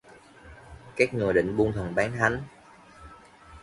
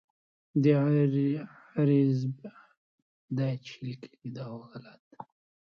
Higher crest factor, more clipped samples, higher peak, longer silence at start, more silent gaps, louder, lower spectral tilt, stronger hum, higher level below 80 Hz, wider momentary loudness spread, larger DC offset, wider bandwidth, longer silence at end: about the same, 22 dB vs 18 dB; neither; first, -6 dBFS vs -12 dBFS; about the same, 0.45 s vs 0.55 s; second, none vs 2.77-3.28 s, 4.99-5.11 s; about the same, -26 LUFS vs -28 LUFS; second, -6.5 dB/octave vs -9.5 dB/octave; neither; first, -50 dBFS vs -74 dBFS; second, 22 LU vs 25 LU; neither; first, 11.5 kHz vs 6.6 kHz; second, 0.05 s vs 0.55 s